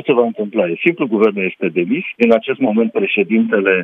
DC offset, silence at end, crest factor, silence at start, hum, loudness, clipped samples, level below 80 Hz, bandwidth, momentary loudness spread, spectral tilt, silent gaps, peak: under 0.1%; 0 s; 16 dB; 0.05 s; none; -16 LUFS; under 0.1%; -70 dBFS; 4.3 kHz; 4 LU; -8.5 dB/octave; none; 0 dBFS